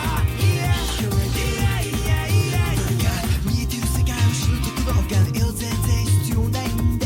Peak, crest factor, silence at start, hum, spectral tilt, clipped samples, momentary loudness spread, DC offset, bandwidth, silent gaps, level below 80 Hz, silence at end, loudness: -8 dBFS; 12 dB; 0 s; none; -5 dB/octave; under 0.1%; 3 LU; under 0.1%; 17 kHz; none; -26 dBFS; 0 s; -21 LUFS